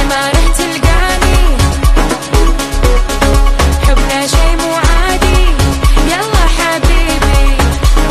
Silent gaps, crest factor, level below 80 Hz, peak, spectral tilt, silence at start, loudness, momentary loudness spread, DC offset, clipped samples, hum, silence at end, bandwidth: none; 8 dB; -10 dBFS; 0 dBFS; -4.5 dB/octave; 0 s; -11 LUFS; 2 LU; under 0.1%; under 0.1%; none; 0 s; 13.5 kHz